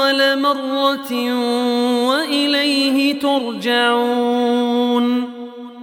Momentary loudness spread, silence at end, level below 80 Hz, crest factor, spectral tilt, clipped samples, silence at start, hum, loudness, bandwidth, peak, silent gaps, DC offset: 5 LU; 0 s; -70 dBFS; 14 dB; -3 dB/octave; under 0.1%; 0 s; none; -17 LUFS; 17 kHz; -2 dBFS; none; under 0.1%